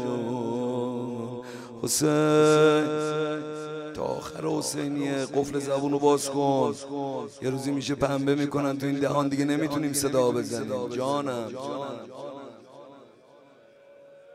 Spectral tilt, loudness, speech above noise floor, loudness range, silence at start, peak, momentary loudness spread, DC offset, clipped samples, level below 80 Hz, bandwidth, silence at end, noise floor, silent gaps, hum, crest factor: -5 dB/octave; -27 LUFS; 29 dB; 6 LU; 0 s; -8 dBFS; 13 LU; under 0.1%; under 0.1%; -62 dBFS; 16 kHz; 0 s; -54 dBFS; none; none; 18 dB